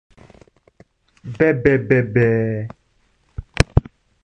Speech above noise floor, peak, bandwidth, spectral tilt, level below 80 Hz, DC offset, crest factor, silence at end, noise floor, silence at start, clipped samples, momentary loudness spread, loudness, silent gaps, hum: 44 dB; 0 dBFS; 11.5 kHz; -7 dB/octave; -32 dBFS; under 0.1%; 20 dB; 0.45 s; -61 dBFS; 1.25 s; under 0.1%; 21 LU; -18 LUFS; none; none